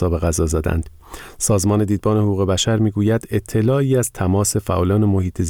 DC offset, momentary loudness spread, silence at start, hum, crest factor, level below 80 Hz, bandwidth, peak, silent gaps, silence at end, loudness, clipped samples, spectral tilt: under 0.1%; 6 LU; 0 s; none; 10 dB; -34 dBFS; 17.5 kHz; -8 dBFS; none; 0 s; -18 LUFS; under 0.1%; -5.5 dB/octave